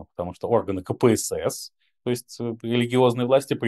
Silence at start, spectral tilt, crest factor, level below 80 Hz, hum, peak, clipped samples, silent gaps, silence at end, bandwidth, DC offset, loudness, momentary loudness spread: 0 s; -5.5 dB/octave; 18 dB; -58 dBFS; none; -4 dBFS; under 0.1%; none; 0 s; 12.5 kHz; under 0.1%; -24 LUFS; 13 LU